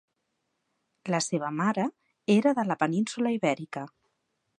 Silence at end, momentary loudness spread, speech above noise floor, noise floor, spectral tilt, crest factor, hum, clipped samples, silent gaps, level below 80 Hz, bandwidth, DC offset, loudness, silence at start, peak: 0.7 s; 15 LU; 52 dB; -79 dBFS; -5.5 dB/octave; 20 dB; none; under 0.1%; none; -78 dBFS; 11 kHz; under 0.1%; -28 LUFS; 1.05 s; -8 dBFS